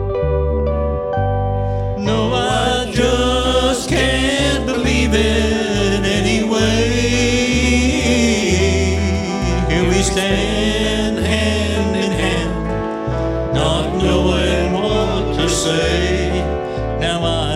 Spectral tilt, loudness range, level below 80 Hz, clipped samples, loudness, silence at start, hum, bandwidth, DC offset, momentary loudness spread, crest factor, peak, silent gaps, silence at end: -5 dB/octave; 2 LU; -24 dBFS; under 0.1%; -16 LUFS; 0 s; none; 14 kHz; under 0.1%; 5 LU; 14 dB; -2 dBFS; none; 0 s